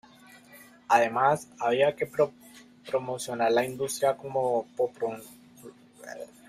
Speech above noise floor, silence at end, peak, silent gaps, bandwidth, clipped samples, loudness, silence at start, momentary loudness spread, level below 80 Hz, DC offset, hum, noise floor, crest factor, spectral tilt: 26 dB; 0.2 s; -6 dBFS; none; 15.5 kHz; under 0.1%; -27 LUFS; 0.55 s; 18 LU; -70 dBFS; under 0.1%; none; -53 dBFS; 22 dB; -4 dB/octave